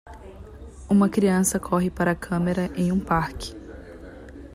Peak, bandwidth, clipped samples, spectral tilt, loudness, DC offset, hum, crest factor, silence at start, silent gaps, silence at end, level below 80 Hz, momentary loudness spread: -8 dBFS; 15.5 kHz; under 0.1%; -6 dB/octave; -23 LUFS; under 0.1%; none; 16 dB; 0.05 s; none; 0 s; -44 dBFS; 23 LU